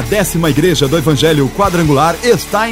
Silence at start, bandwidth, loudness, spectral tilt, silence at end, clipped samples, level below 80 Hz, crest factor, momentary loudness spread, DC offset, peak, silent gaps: 0 s; 16.5 kHz; -12 LUFS; -5 dB/octave; 0 s; under 0.1%; -30 dBFS; 10 dB; 2 LU; under 0.1%; 0 dBFS; none